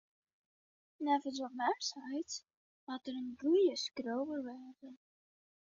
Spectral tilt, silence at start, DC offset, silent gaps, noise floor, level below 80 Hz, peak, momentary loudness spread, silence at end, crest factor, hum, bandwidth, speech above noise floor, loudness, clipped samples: -1 dB/octave; 1 s; under 0.1%; 2.57-2.87 s; under -90 dBFS; -84 dBFS; -20 dBFS; 21 LU; 0.8 s; 18 dB; none; 7.4 kHz; over 53 dB; -37 LUFS; under 0.1%